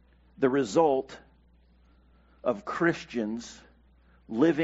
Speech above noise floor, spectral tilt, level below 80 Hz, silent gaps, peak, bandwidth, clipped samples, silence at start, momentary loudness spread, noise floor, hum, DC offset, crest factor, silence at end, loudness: 34 dB; -5 dB/octave; -60 dBFS; none; -10 dBFS; 8 kHz; under 0.1%; 0.4 s; 17 LU; -60 dBFS; none; under 0.1%; 20 dB; 0 s; -28 LUFS